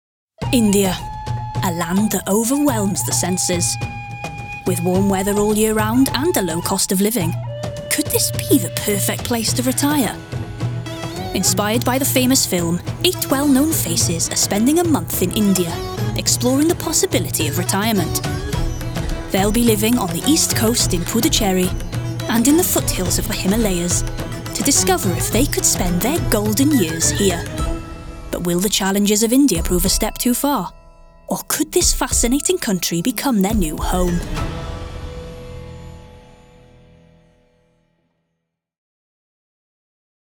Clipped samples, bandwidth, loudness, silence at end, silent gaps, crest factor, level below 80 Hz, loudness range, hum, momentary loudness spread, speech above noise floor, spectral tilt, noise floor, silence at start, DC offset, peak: under 0.1%; over 20 kHz; -18 LUFS; 4 s; none; 18 dB; -32 dBFS; 3 LU; none; 11 LU; 59 dB; -4 dB/octave; -76 dBFS; 0.4 s; under 0.1%; 0 dBFS